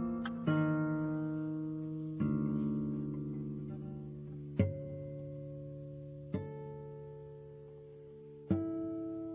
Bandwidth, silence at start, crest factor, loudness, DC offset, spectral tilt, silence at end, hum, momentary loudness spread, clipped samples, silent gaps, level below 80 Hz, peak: 3.9 kHz; 0 s; 22 dB; -38 LUFS; under 0.1%; -9 dB/octave; 0 s; none; 17 LU; under 0.1%; none; -58 dBFS; -18 dBFS